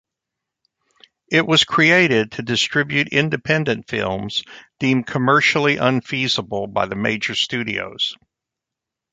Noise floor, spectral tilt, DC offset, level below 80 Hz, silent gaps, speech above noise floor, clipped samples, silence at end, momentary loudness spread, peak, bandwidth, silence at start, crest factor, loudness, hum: -85 dBFS; -4.5 dB/octave; under 0.1%; -56 dBFS; none; 66 dB; under 0.1%; 1 s; 10 LU; -2 dBFS; 9.4 kHz; 1.3 s; 18 dB; -18 LUFS; none